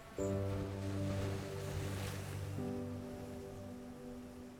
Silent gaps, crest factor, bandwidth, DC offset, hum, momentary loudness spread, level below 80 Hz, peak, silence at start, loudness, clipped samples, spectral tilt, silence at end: none; 14 dB; 17.5 kHz; under 0.1%; none; 10 LU; -58 dBFS; -28 dBFS; 0 s; -43 LUFS; under 0.1%; -6.5 dB/octave; 0 s